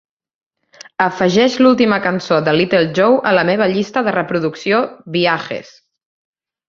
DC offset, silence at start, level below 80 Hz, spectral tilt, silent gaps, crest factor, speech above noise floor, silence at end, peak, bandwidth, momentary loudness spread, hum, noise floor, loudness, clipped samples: under 0.1%; 1 s; -56 dBFS; -5.5 dB/octave; none; 16 dB; 29 dB; 1.05 s; 0 dBFS; 7.4 kHz; 8 LU; none; -43 dBFS; -15 LUFS; under 0.1%